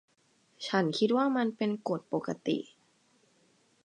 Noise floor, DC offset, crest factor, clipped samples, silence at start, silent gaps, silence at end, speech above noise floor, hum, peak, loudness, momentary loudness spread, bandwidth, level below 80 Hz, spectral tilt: -69 dBFS; under 0.1%; 20 dB; under 0.1%; 0.6 s; none; 1.2 s; 39 dB; none; -12 dBFS; -31 LUFS; 8 LU; 9.8 kHz; -82 dBFS; -6 dB/octave